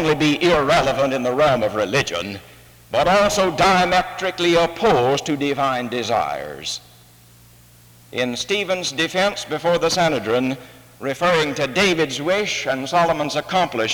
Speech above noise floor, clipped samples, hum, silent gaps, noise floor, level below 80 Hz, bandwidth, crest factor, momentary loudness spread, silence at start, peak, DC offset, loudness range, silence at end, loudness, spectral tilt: 29 dB; under 0.1%; none; none; -48 dBFS; -46 dBFS; over 20 kHz; 16 dB; 10 LU; 0 s; -4 dBFS; under 0.1%; 6 LU; 0 s; -19 LUFS; -4 dB/octave